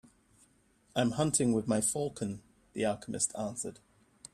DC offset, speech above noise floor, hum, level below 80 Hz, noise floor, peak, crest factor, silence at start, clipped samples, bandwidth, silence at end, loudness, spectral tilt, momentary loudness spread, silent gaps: under 0.1%; 36 dB; none; -64 dBFS; -68 dBFS; -14 dBFS; 20 dB; 0.95 s; under 0.1%; 14 kHz; 0.6 s; -32 LUFS; -4.5 dB/octave; 13 LU; none